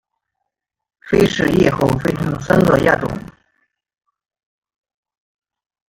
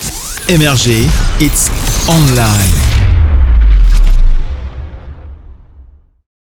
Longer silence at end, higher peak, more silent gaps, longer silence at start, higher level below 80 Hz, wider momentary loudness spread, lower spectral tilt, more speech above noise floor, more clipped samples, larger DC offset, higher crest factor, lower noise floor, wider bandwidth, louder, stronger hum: first, 2.65 s vs 0.7 s; about the same, -2 dBFS vs 0 dBFS; neither; first, 1.05 s vs 0 s; second, -42 dBFS vs -12 dBFS; second, 8 LU vs 17 LU; first, -6.5 dB/octave vs -4.5 dB/octave; first, 63 dB vs 30 dB; neither; neither; first, 18 dB vs 10 dB; first, -78 dBFS vs -39 dBFS; about the same, 17 kHz vs 18.5 kHz; second, -16 LUFS vs -11 LUFS; neither